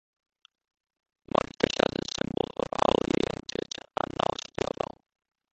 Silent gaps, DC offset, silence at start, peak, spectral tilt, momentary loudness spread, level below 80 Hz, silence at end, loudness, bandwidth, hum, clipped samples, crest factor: none; under 0.1%; 3.2 s; -4 dBFS; -4.5 dB/octave; 10 LU; -54 dBFS; 0.9 s; -30 LUFS; 8.8 kHz; none; under 0.1%; 28 dB